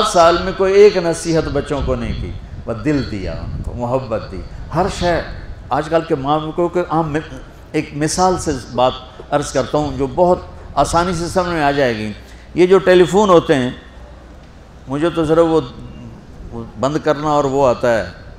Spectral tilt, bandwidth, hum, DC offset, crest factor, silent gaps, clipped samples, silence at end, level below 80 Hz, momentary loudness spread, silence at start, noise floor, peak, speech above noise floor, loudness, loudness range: -5.5 dB/octave; 14.5 kHz; none; under 0.1%; 16 dB; none; under 0.1%; 0.05 s; -34 dBFS; 19 LU; 0 s; -39 dBFS; 0 dBFS; 23 dB; -16 LUFS; 6 LU